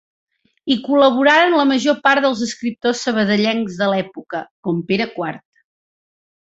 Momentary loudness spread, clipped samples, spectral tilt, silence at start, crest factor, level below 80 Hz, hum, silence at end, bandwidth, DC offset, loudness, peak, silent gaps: 14 LU; under 0.1%; -4.5 dB/octave; 0.65 s; 16 dB; -62 dBFS; none; 1.15 s; 8 kHz; under 0.1%; -17 LUFS; -2 dBFS; 4.51-4.63 s